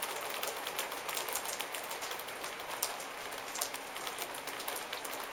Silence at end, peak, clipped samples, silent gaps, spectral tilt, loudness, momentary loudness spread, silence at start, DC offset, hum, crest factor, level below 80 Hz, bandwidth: 0 s; -10 dBFS; under 0.1%; none; 0 dB/octave; -38 LUFS; 4 LU; 0 s; under 0.1%; none; 30 dB; -74 dBFS; 19 kHz